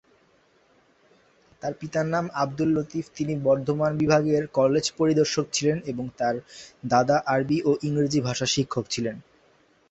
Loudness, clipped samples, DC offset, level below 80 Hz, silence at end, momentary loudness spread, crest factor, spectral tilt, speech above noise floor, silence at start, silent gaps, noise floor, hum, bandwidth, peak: -25 LUFS; under 0.1%; under 0.1%; -58 dBFS; 0.7 s; 11 LU; 20 dB; -5 dB/octave; 38 dB; 1.65 s; none; -62 dBFS; none; 8.2 kHz; -4 dBFS